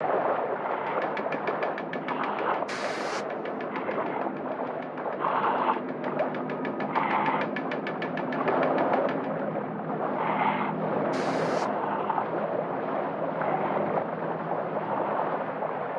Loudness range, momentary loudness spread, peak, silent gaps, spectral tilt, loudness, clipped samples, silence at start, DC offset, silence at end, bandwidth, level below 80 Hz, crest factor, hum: 3 LU; 6 LU; -12 dBFS; none; -6.5 dB/octave; -29 LUFS; under 0.1%; 0 s; under 0.1%; 0 s; 11 kHz; -78 dBFS; 16 dB; none